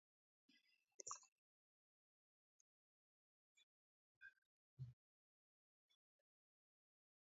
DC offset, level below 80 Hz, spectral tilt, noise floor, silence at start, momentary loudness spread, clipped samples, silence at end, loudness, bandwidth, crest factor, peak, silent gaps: under 0.1%; under -90 dBFS; -3.5 dB/octave; under -90 dBFS; 0.5 s; 12 LU; under 0.1%; 2.45 s; -59 LUFS; 7.4 kHz; 32 dB; -36 dBFS; 0.94-0.99 s, 1.28-3.55 s, 3.63-4.21 s, 4.38-4.77 s